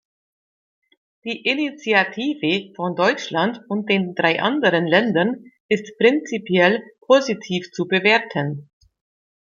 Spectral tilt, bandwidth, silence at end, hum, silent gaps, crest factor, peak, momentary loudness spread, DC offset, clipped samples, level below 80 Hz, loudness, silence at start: -5.5 dB/octave; 7.4 kHz; 0.9 s; none; 5.60-5.69 s; 20 dB; -2 dBFS; 9 LU; under 0.1%; under 0.1%; -68 dBFS; -20 LUFS; 1.25 s